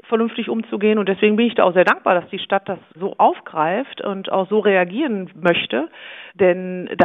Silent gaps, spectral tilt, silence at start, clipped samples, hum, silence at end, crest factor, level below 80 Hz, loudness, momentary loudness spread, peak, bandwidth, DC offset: none; -7.5 dB/octave; 0.1 s; under 0.1%; none; 0 s; 18 dB; -68 dBFS; -19 LUFS; 11 LU; 0 dBFS; 6.2 kHz; under 0.1%